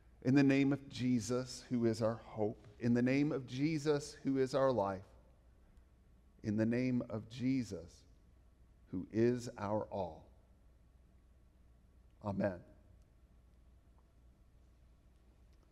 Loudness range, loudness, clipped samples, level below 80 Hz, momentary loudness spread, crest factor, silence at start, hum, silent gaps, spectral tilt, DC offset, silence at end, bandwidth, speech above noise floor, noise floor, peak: 12 LU; -37 LUFS; under 0.1%; -66 dBFS; 14 LU; 20 dB; 0.25 s; none; none; -7 dB/octave; under 0.1%; 3.1 s; 12 kHz; 30 dB; -65 dBFS; -18 dBFS